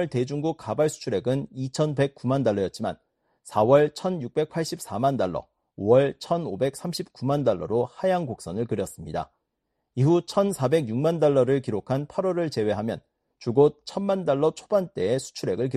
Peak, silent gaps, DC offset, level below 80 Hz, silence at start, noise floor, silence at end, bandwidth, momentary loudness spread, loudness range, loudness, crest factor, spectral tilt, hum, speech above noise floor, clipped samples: -6 dBFS; none; under 0.1%; -60 dBFS; 0 s; -79 dBFS; 0 s; 13 kHz; 11 LU; 3 LU; -25 LUFS; 20 dB; -6.5 dB/octave; none; 55 dB; under 0.1%